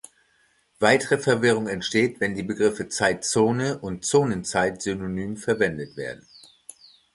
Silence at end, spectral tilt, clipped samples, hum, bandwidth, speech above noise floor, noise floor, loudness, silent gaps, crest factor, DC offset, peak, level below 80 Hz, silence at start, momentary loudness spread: 1 s; -4.5 dB/octave; under 0.1%; none; 11.5 kHz; 41 dB; -64 dBFS; -23 LUFS; none; 22 dB; under 0.1%; -2 dBFS; -56 dBFS; 0.8 s; 11 LU